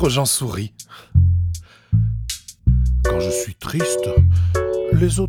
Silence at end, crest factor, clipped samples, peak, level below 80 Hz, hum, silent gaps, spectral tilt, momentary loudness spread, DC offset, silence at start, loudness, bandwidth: 0 s; 16 dB; under 0.1%; -2 dBFS; -24 dBFS; none; none; -5.5 dB/octave; 11 LU; under 0.1%; 0 s; -19 LUFS; 16.5 kHz